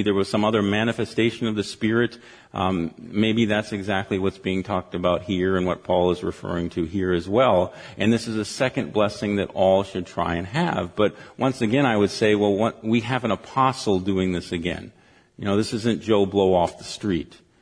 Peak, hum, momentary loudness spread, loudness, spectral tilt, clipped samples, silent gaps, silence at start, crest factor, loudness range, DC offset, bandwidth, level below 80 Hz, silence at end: -4 dBFS; none; 8 LU; -23 LUFS; -6 dB/octave; under 0.1%; none; 0 s; 18 dB; 2 LU; under 0.1%; 10.5 kHz; -52 dBFS; 0.25 s